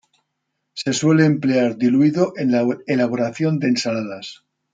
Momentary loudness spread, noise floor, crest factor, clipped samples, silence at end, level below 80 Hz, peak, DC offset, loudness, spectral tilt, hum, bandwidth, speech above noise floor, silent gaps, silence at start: 12 LU; -76 dBFS; 16 dB; under 0.1%; 0.4 s; -66 dBFS; -4 dBFS; under 0.1%; -19 LUFS; -6 dB/octave; none; 9.4 kHz; 58 dB; none; 0.75 s